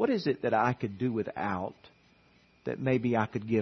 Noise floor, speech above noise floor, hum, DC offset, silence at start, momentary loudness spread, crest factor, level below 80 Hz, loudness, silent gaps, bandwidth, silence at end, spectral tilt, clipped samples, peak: -63 dBFS; 34 dB; none; under 0.1%; 0 s; 10 LU; 20 dB; -68 dBFS; -31 LUFS; none; 6.4 kHz; 0 s; -8 dB/octave; under 0.1%; -12 dBFS